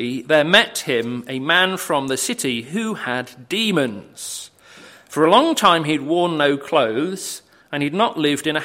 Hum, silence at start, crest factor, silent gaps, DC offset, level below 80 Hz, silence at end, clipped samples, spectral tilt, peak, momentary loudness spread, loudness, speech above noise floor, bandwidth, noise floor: none; 0 s; 20 dB; none; under 0.1%; -64 dBFS; 0 s; under 0.1%; -3.5 dB/octave; 0 dBFS; 15 LU; -18 LUFS; 26 dB; 16.5 kHz; -45 dBFS